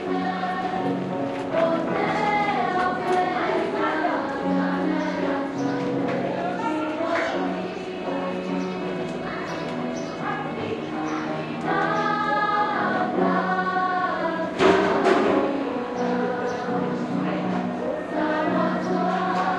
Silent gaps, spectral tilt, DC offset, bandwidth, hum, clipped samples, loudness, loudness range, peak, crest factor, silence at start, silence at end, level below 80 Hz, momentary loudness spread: none; -6.5 dB/octave; under 0.1%; 10.5 kHz; none; under 0.1%; -24 LUFS; 6 LU; -6 dBFS; 18 dB; 0 s; 0 s; -60 dBFS; 7 LU